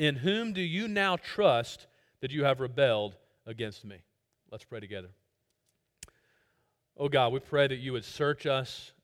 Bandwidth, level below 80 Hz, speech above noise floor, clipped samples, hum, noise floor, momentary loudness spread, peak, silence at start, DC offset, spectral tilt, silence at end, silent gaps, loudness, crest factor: 14.5 kHz; -68 dBFS; 48 dB; under 0.1%; none; -78 dBFS; 18 LU; -10 dBFS; 0 s; under 0.1%; -5.5 dB/octave; 0.15 s; none; -30 LUFS; 22 dB